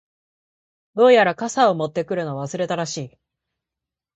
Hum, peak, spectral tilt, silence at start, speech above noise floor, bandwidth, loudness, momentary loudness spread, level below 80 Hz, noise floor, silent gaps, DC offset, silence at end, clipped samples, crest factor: none; -2 dBFS; -4.5 dB/octave; 0.95 s; 68 dB; 8.4 kHz; -19 LUFS; 16 LU; -66 dBFS; -87 dBFS; none; under 0.1%; 1.1 s; under 0.1%; 20 dB